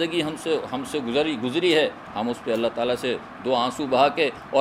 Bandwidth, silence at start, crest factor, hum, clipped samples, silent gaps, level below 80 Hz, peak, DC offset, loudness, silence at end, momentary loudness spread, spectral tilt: 15.5 kHz; 0 s; 18 dB; none; under 0.1%; none; -60 dBFS; -6 dBFS; under 0.1%; -24 LUFS; 0 s; 8 LU; -4.5 dB/octave